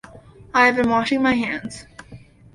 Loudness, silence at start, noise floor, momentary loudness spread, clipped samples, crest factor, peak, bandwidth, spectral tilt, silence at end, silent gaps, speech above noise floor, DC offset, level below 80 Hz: -19 LUFS; 0.15 s; -44 dBFS; 17 LU; under 0.1%; 20 dB; -2 dBFS; 11.5 kHz; -4.5 dB/octave; 0.4 s; none; 25 dB; under 0.1%; -50 dBFS